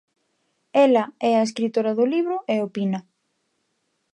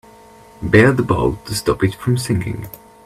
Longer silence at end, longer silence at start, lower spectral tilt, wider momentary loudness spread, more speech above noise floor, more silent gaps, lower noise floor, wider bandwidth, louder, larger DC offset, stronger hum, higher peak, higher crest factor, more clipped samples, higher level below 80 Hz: first, 1.1 s vs 0.3 s; first, 0.75 s vs 0.6 s; about the same, -6 dB/octave vs -6 dB/octave; second, 8 LU vs 16 LU; first, 52 dB vs 27 dB; neither; first, -73 dBFS vs -44 dBFS; second, 10.5 kHz vs 15 kHz; second, -22 LUFS vs -17 LUFS; neither; neither; second, -6 dBFS vs 0 dBFS; about the same, 18 dB vs 18 dB; neither; second, -78 dBFS vs -38 dBFS